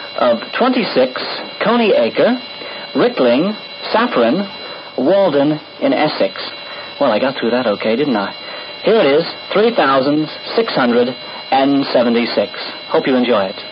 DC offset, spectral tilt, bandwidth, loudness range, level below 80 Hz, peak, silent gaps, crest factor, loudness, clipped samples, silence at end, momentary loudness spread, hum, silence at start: under 0.1%; -9 dB/octave; 5.6 kHz; 2 LU; -68 dBFS; -2 dBFS; none; 14 dB; -15 LUFS; under 0.1%; 0 s; 12 LU; none; 0 s